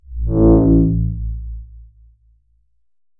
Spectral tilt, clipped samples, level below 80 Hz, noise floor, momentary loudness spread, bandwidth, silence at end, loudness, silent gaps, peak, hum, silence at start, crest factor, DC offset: -17 dB/octave; under 0.1%; -24 dBFS; -62 dBFS; 20 LU; 1.7 kHz; 1.35 s; -15 LUFS; none; -2 dBFS; none; 0.1 s; 16 dB; under 0.1%